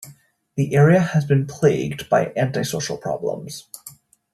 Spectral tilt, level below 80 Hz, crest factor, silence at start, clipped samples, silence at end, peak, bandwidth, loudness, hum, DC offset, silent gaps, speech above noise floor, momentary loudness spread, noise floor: -6.5 dB/octave; -56 dBFS; 18 dB; 0 s; under 0.1%; 0.45 s; -2 dBFS; 13.5 kHz; -20 LUFS; none; under 0.1%; none; 30 dB; 18 LU; -50 dBFS